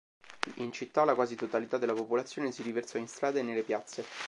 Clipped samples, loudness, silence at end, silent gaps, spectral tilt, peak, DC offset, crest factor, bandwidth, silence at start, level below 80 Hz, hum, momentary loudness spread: under 0.1%; -33 LUFS; 0 s; none; -4.5 dB/octave; -8 dBFS; under 0.1%; 26 dB; 11.5 kHz; 0.25 s; -82 dBFS; none; 11 LU